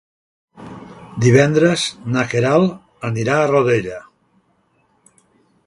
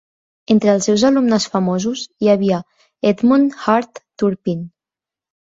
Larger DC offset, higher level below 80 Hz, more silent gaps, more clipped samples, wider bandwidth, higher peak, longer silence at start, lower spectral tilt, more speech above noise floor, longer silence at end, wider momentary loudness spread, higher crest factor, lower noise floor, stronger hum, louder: neither; about the same, -54 dBFS vs -58 dBFS; neither; neither; first, 11.5 kHz vs 7.8 kHz; about the same, 0 dBFS vs -2 dBFS; about the same, 0.6 s vs 0.5 s; about the same, -6 dB/octave vs -5.5 dB/octave; second, 46 dB vs 73 dB; first, 1.65 s vs 0.75 s; first, 23 LU vs 9 LU; about the same, 18 dB vs 16 dB; second, -61 dBFS vs -88 dBFS; neither; about the same, -16 LUFS vs -17 LUFS